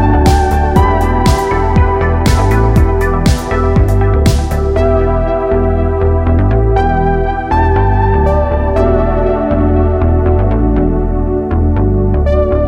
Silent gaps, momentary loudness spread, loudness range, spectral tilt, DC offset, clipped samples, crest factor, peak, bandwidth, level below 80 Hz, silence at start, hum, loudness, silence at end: none; 3 LU; 1 LU; -7.5 dB/octave; under 0.1%; under 0.1%; 10 dB; 0 dBFS; 16.5 kHz; -14 dBFS; 0 s; none; -12 LUFS; 0 s